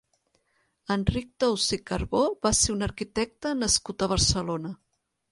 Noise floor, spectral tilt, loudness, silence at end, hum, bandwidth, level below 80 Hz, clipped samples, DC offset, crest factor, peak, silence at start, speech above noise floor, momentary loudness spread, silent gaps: -72 dBFS; -3.5 dB/octave; -26 LUFS; 0.55 s; none; 11.5 kHz; -42 dBFS; under 0.1%; under 0.1%; 20 dB; -8 dBFS; 0.9 s; 45 dB; 9 LU; none